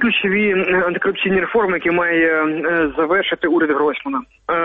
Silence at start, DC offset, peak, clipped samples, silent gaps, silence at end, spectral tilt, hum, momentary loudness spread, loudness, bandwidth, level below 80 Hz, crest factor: 0 s; under 0.1%; -6 dBFS; under 0.1%; none; 0 s; -8.5 dB/octave; none; 4 LU; -17 LUFS; 4.4 kHz; -50 dBFS; 10 dB